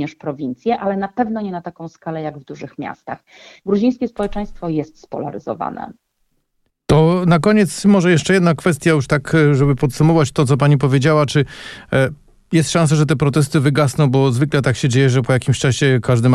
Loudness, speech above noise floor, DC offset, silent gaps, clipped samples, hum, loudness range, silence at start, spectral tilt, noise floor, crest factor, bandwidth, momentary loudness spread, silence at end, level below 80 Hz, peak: -16 LUFS; 52 dB; under 0.1%; none; under 0.1%; none; 9 LU; 0 s; -6.5 dB/octave; -67 dBFS; 12 dB; 13 kHz; 15 LU; 0 s; -42 dBFS; -4 dBFS